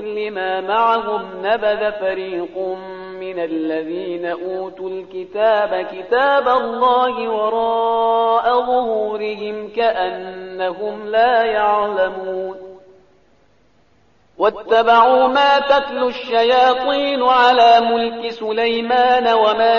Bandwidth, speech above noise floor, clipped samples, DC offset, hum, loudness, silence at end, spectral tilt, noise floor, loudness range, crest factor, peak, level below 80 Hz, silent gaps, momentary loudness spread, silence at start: 7 kHz; 40 dB; under 0.1%; 0.1%; 50 Hz at -65 dBFS; -17 LUFS; 0 s; -0.5 dB/octave; -57 dBFS; 8 LU; 16 dB; -2 dBFS; -56 dBFS; none; 13 LU; 0 s